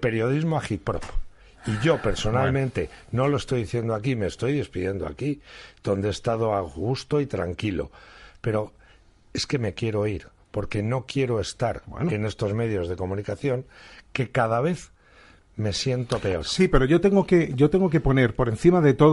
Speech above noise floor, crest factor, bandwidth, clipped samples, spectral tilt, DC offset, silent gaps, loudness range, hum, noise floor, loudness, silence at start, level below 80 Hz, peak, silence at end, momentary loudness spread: 31 dB; 20 dB; 11.5 kHz; under 0.1%; -6.5 dB/octave; under 0.1%; none; 7 LU; none; -54 dBFS; -25 LUFS; 0 s; -40 dBFS; -4 dBFS; 0 s; 13 LU